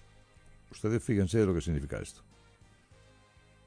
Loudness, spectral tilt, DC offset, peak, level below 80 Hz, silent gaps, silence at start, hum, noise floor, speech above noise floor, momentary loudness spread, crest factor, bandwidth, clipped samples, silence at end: -31 LUFS; -7 dB/octave; under 0.1%; -14 dBFS; -48 dBFS; none; 0.7 s; none; -61 dBFS; 31 dB; 15 LU; 20 dB; 10.5 kHz; under 0.1%; 1.55 s